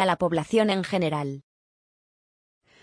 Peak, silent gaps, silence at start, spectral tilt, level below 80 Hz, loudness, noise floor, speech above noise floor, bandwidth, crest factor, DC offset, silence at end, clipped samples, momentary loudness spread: -8 dBFS; none; 0 s; -6 dB/octave; -62 dBFS; -25 LUFS; under -90 dBFS; over 66 dB; 10.5 kHz; 18 dB; under 0.1%; 1.45 s; under 0.1%; 11 LU